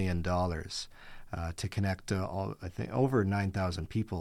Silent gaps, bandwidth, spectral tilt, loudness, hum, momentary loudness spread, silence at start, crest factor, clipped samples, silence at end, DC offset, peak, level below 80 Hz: none; 14 kHz; -6.5 dB/octave; -33 LUFS; none; 11 LU; 0 s; 16 dB; under 0.1%; 0 s; under 0.1%; -16 dBFS; -48 dBFS